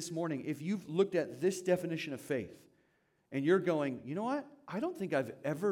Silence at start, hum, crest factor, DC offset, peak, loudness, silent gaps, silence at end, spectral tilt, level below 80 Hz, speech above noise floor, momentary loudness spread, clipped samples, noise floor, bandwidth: 0 s; none; 18 dB; under 0.1%; -16 dBFS; -35 LUFS; none; 0 s; -6 dB/octave; -80 dBFS; 40 dB; 9 LU; under 0.1%; -75 dBFS; 16.5 kHz